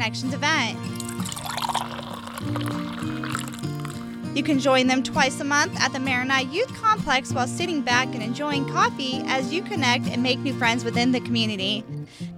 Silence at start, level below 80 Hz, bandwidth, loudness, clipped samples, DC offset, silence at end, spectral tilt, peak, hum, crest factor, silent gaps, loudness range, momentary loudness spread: 0 s; -56 dBFS; 16.5 kHz; -24 LUFS; under 0.1%; under 0.1%; 0 s; -4 dB/octave; -6 dBFS; none; 18 dB; none; 7 LU; 10 LU